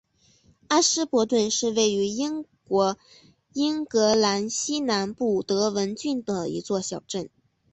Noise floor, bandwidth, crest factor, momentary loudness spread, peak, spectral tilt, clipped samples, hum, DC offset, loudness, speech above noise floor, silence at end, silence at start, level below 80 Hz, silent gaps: -60 dBFS; 8.4 kHz; 16 dB; 11 LU; -8 dBFS; -3.5 dB/octave; under 0.1%; none; under 0.1%; -24 LUFS; 36 dB; 0.45 s; 0.7 s; -64 dBFS; none